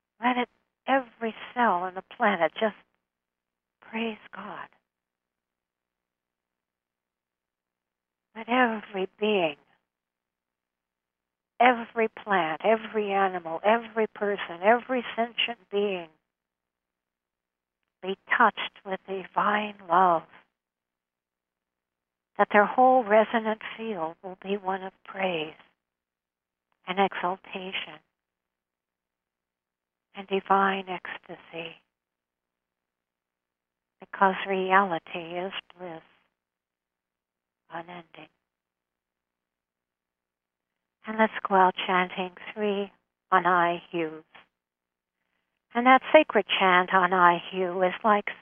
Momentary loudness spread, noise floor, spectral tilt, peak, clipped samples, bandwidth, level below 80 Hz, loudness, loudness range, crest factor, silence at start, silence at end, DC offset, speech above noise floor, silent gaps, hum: 19 LU; -90 dBFS; -8 dB/octave; -4 dBFS; under 0.1%; 3.7 kHz; -76 dBFS; -26 LUFS; 16 LU; 26 dB; 0.2 s; 0.05 s; under 0.1%; 64 dB; none; 60 Hz at -65 dBFS